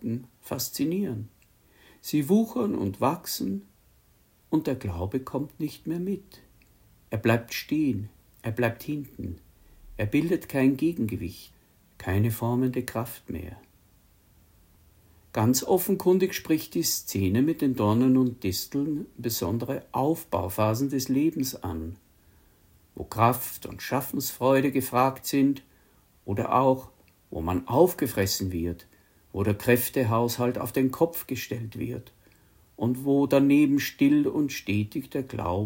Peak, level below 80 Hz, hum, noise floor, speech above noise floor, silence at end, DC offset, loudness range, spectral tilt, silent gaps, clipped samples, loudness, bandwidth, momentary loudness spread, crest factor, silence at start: -6 dBFS; -56 dBFS; none; -62 dBFS; 36 dB; 0 s; under 0.1%; 6 LU; -5.5 dB/octave; none; under 0.1%; -27 LUFS; 16.5 kHz; 14 LU; 20 dB; 0 s